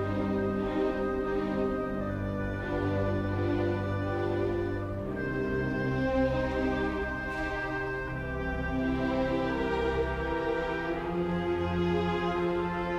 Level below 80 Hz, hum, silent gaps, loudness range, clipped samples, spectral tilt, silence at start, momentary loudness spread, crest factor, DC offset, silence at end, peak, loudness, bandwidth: -42 dBFS; none; none; 1 LU; under 0.1%; -8 dB/octave; 0 s; 4 LU; 12 dB; under 0.1%; 0 s; -18 dBFS; -31 LUFS; 11.5 kHz